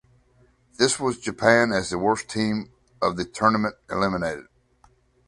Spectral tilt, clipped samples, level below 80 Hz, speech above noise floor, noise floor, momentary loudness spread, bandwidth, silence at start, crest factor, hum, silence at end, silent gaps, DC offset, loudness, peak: -4 dB/octave; under 0.1%; -54 dBFS; 37 dB; -60 dBFS; 10 LU; 11.5 kHz; 0.8 s; 22 dB; none; 0.85 s; none; under 0.1%; -23 LUFS; -2 dBFS